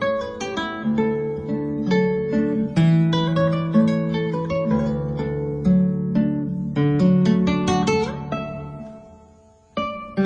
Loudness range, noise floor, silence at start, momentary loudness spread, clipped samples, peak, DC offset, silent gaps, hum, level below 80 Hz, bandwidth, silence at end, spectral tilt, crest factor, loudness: 2 LU; -51 dBFS; 0 s; 11 LU; under 0.1%; -6 dBFS; under 0.1%; none; none; -46 dBFS; 8.8 kHz; 0 s; -7.5 dB/octave; 14 dB; -21 LUFS